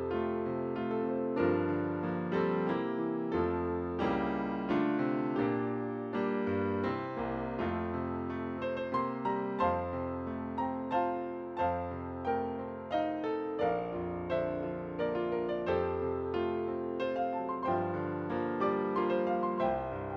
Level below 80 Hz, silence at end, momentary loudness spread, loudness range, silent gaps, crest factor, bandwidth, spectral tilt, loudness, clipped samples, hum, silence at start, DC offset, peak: -58 dBFS; 0 s; 5 LU; 2 LU; none; 16 dB; 6.2 kHz; -9 dB/octave; -34 LUFS; under 0.1%; none; 0 s; under 0.1%; -18 dBFS